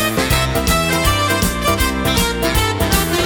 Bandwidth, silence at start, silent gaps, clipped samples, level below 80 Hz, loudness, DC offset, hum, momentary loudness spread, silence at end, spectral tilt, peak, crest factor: over 20 kHz; 0 s; none; under 0.1%; -24 dBFS; -16 LUFS; under 0.1%; none; 1 LU; 0 s; -3.5 dB/octave; 0 dBFS; 16 dB